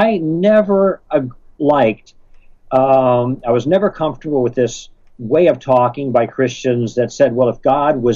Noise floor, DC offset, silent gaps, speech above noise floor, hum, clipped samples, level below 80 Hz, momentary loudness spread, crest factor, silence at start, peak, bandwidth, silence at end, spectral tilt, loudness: -42 dBFS; under 0.1%; none; 27 dB; none; under 0.1%; -46 dBFS; 7 LU; 14 dB; 0 s; -2 dBFS; 7.6 kHz; 0 s; -7 dB/octave; -15 LUFS